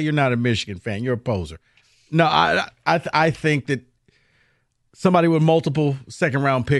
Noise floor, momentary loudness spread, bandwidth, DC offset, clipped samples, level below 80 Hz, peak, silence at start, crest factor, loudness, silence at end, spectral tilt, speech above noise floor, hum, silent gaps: -65 dBFS; 10 LU; 11.5 kHz; under 0.1%; under 0.1%; -52 dBFS; -2 dBFS; 0 s; 18 dB; -20 LUFS; 0 s; -6.5 dB/octave; 46 dB; none; none